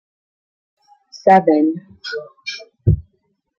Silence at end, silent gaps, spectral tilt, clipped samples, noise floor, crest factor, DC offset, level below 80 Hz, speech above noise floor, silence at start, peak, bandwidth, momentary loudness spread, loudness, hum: 0.6 s; none; -7.5 dB/octave; under 0.1%; -67 dBFS; 18 dB; under 0.1%; -38 dBFS; 52 dB; 1.15 s; -2 dBFS; 7.4 kHz; 17 LU; -17 LUFS; none